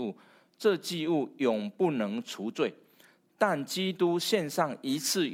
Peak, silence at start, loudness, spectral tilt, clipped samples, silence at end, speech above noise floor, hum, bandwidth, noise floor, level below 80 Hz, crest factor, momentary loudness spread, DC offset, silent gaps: -10 dBFS; 0 s; -30 LUFS; -4 dB/octave; under 0.1%; 0 s; 33 dB; none; 17 kHz; -62 dBFS; -84 dBFS; 20 dB; 5 LU; under 0.1%; none